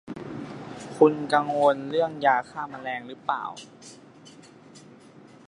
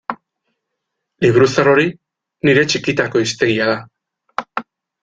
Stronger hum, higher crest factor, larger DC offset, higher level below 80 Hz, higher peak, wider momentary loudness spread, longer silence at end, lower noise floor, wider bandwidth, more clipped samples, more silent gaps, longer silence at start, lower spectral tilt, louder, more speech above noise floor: neither; first, 24 dB vs 16 dB; neither; second, -68 dBFS vs -52 dBFS; about the same, -4 dBFS vs -2 dBFS; first, 19 LU vs 16 LU; second, 0.2 s vs 0.4 s; second, -50 dBFS vs -77 dBFS; first, 11 kHz vs 9.2 kHz; neither; neither; about the same, 0.05 s vs 0.1 s; about the same, -5.5 dB/octave vs -5 dB/octave; second, -25 LUFS vs -15 LUFS; second, 25 dB vs 63 dB